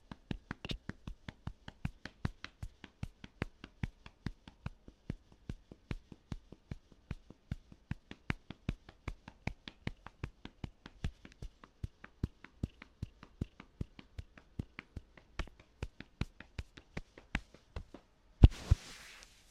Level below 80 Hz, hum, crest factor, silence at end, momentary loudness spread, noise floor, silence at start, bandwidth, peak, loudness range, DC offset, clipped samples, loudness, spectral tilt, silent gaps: -44 dBFS; none; 34 dB; 0.25 s; 9 LU; -60 dBFS; 0.3 s; 11 kHz; -6 dBFS; 13 LU; under 0.1%; under 0.1%; -43 LUFS; -6.5 dB/octave; none